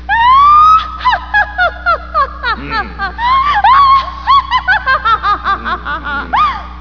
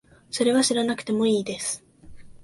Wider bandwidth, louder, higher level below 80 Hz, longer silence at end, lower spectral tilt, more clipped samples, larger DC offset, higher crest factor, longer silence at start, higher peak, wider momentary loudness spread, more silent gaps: second, 5.4 kHz vs 12 kHz; first, -10 LUFS vs -24 LUFS; first, -28 dBFS vs -58 dBFS; about the same, 0 s vs 0.05 s; about the same, -4.5 dB/octave vs -3.5 dB/octave; neither; first, 0.8% vs under 0.1%; about the same, 12 dB vs 16 dB; second, 0 s vs 0.3 s; first, 0 dBFS vs -10 dBFS; about the same, 11 LU vs 11 LU; neither